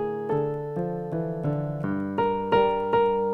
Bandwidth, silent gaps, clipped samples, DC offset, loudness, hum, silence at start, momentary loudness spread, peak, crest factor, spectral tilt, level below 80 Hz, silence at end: 5.6 kHz; none; under 0.1%; under 0.1%; -26 LUFS; none; 0 s; 8 LU; -10 dBFS; 14 dB; -9 dB/octave; -54 dBFS; 0 s